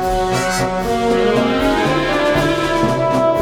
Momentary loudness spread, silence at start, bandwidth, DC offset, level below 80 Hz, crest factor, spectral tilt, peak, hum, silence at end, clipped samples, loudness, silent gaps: 3 LU; 0 s; 19 kHz; under 0.1%; -32 dBFS; 12 dB; -5 dB/octave; -4 dBFS; none; 0 s; under 0.1%; -16 LUFS; none